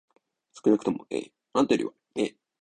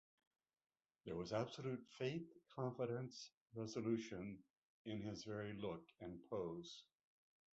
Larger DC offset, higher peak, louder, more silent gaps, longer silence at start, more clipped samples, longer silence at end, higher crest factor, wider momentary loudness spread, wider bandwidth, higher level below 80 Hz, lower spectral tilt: neither; first, -10 dBFS vs -30 dBFS; first, -28 LUFS vs -49 LUFS; second, none vs 3.34-3.46 s, 4.50-4.85 s; second, 0.55 s vs 1.05 s; neither; second, 0.3 s vs 0.75 s; about the same, 18 dB vs 20 dB; about the same, 10 LU vs 12 LU; first, 9.8 kHz vs 8 kHz; first, -68 dBFS vs -76 dBFS; about the same, -5.5 dB/octave vs -6 dB/octave